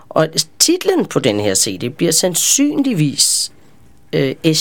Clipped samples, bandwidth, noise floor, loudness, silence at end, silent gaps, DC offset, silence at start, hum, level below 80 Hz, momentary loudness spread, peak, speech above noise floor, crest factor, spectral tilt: under 0.1%; 19 kHz; -49 dBFS; -14 LUFS; 0 s; none; 0.7%; 0.15 s; none; -56 dBFS; 7 LU; 0 dBFS; 34 dB; 16 dB; -3 dB/octave